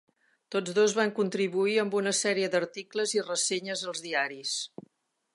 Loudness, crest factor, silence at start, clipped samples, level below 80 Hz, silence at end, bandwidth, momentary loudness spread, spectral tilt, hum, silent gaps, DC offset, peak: -28 LUFS; 18 dB; 0.5 s; under 0.1%; -84 dBFS; 0.65 s; 11.5 kHz; 8 LU; -2.5 dB/octave; none; none; under 0.1%; -10 dBFS